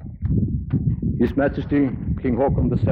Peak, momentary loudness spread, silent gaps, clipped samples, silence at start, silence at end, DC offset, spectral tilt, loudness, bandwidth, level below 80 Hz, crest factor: -8 dBFS; 3 LU; none; under 0.1%; 0 s; 0 s; under 0.1%; -11.5 dB/octave; -22 LUFS; 5 kHz; -32 dBFS; 14 dB